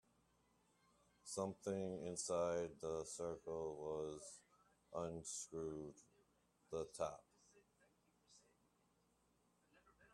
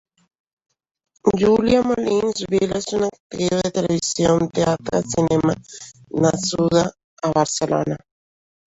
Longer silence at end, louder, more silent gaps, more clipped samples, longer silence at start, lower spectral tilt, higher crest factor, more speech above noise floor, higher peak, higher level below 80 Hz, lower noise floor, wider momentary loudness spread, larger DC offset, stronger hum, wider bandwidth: second, 0.05 s vs 0.75 s; second, -47 LUFS vs -20 LUFS; second, none vs 3.20-3.30 s, 7.04-7.17 s; neither; about the same, 1.25 s vs 1.25 s; about the same, -4.5 dB/octave vs -5 dB/octave; about the same, 22 dB vs 18 dB; second, 34 dB vs over 71 dB; second, -28 dBFS vs -4 dBFS; second, -78 dBFS vs -48 dBFS; second, -80 dBFS vs under -90 dBFS; first, 12 LU vs 9 LU; neither; neither; first, 13.5 kHz vs 8.2 kHz